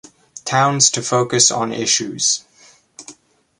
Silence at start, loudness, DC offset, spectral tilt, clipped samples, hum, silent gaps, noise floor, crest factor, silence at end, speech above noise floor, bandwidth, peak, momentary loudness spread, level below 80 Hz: 0.35 s; -15 LUFS; under 0.1%; -2 dB/octave; under 0.1%; none; none; -50 dBFS; 20 dB; 0.45 s; 34 dB; 11.5 kHz; 0 dBFS; 7 LU; -62 dBFS